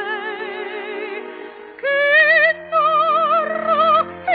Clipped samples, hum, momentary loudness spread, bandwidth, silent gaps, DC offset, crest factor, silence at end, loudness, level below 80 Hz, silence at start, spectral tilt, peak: under 0.1%; none; 17 LU; 4.9 kHz; none; under 0.1%; 14 dB; 0 s; -16 LUFS; -64 dBFS; 0 s; 0.5 dB/octave; -4 dBFS